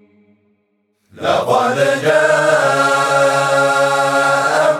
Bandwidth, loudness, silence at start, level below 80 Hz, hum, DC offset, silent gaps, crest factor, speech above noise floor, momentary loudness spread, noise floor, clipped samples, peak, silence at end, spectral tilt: 16.5 kHz; -13 LUFS; 1.15 s; -68 dBFS; none; under 0.1%; none; 14 dB; 50 dB; 3 LU; -64 dBFS; under 0.1%; 0 dBFS; 0 s; -3.5 dB/octave